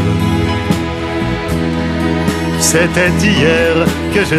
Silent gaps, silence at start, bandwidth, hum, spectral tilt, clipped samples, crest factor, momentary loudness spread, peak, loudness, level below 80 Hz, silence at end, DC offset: none; 0 s; 14.5 kHz; none; -4.5 dB/octave; under 0.1%; 14 dB; 6 LU; 0 dBFS; -13 LUFS; -32 dBFS; 0 s; under 0.1%